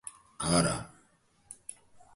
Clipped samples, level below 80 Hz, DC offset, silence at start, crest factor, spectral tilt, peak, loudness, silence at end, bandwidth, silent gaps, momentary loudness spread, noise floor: under 0.1%; -54 dBFS; under 0.1%; 0.05 s; 22 dB; -4 dB/octave; -12 dBFS; -29 LUFS; 0.6 s; 11.5 kHz; none; 22 LU; -67 dBFS